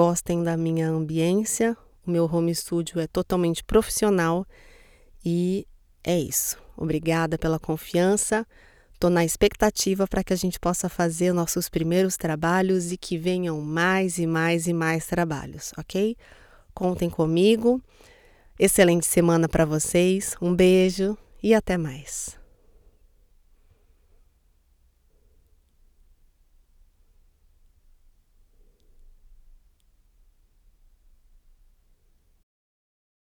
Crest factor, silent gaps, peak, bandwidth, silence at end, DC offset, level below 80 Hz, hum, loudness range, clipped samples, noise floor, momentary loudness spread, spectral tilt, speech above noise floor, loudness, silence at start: 22 dB; none; -4 dBFS; 19.5 kHz; 11 s; under 0.1%; -46 dBFS; none; 5 LU; under 0.1%; -62 dBFS; 9 LU; -5 dB/octave; 39 dB; -24 LUFS; 0 s